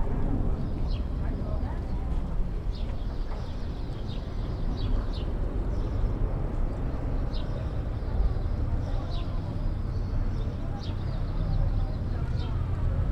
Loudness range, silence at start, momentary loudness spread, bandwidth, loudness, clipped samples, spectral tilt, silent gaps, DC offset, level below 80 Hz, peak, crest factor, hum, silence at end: 2 LU; 0 s; 5 LU; 6 kHz; -32 LUFS; under 0.1%; -8.5 dB/octave; none; under 0.1%; -30 dBFS; -14 dBFS; 14 dB; none; 0 s